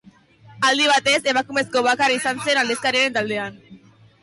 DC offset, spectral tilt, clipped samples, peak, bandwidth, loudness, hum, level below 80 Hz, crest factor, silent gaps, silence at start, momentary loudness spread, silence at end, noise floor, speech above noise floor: under 0.1%; -2 dB/octave; under 0.1%; -8 dBFS; 11.5 kHz; -19 LUFS; none; -64 dBFS; 12 dB; none; 0.5 s; 7 LU; 0.45 s; -49 dBFS; 29 dB